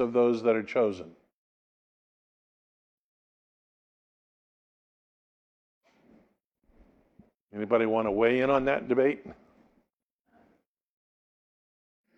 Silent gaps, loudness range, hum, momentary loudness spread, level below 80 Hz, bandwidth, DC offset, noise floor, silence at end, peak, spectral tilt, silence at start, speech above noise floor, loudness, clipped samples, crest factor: 1.33-5.81 s, 6.44-6.52 s, 7.36-7.48 s; 9 LU; none; 15 LU; -64 dBFS; 7.2 kHz; under 0.1%; -79 dBFS; 2.85 s; -10 dBFS; -7 dB/octave; 0 s; 53 dB; -27 LUFS; under 0.1%; 22 dB